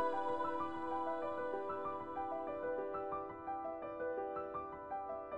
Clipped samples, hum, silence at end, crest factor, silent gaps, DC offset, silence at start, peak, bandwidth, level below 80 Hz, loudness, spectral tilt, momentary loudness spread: under 0.1%; none; 0 s; 16 dB; none; under 0.1%; 0 s; -26 dBFS; 8.6 kHz; -70 dBFS; -42 LUFS; -7 dB/octave; 6 LU